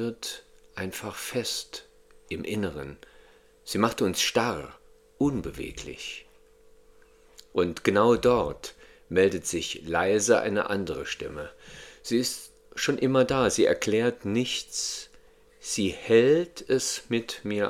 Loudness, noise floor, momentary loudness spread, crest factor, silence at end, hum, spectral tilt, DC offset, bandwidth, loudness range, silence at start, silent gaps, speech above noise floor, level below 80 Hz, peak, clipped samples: -27 LUFS; -56 dBFS; 18 LU; 22 dB; 0 s; none; -4 dB/octave; under 0.1%; 16.5 kHz; 7 LU; 0 s; none; 30 dB; -54 dBFS; -6 dBFS; under 0.1%